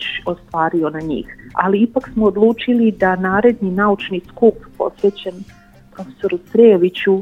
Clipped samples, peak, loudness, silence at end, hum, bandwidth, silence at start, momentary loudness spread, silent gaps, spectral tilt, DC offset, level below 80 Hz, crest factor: under 0.1%; 0 dBFS; -16 LUFS; 0 s; none; 6.6 kHz; 0 s; 12 LU; none; -8 dB/octave; under 0.1%; -46 dBFS; 16 dB